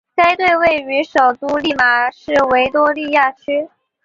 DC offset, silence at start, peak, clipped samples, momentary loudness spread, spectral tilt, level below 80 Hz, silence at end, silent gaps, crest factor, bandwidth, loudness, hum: under 0.1%; 0.15 s; -2 dBFS; under 0.1%; 7 LU; -4 dB/octave; -50 dBFS; 0.4 s; none; 14 dB; 7.8 kHz; -14 LUFS; none